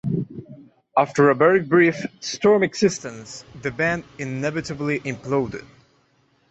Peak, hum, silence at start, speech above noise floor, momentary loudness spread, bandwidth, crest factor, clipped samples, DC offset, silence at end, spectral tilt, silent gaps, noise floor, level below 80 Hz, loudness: -4 dBFS; none; 0.05 s; 42 dB; 17 LU; 8.2 kHz; 18 dB; under 0.1%; under 0.1%; 0.85 s; -5.5 dB/octave; none; -62 dBFS; -56 dBFS; -21 LUFS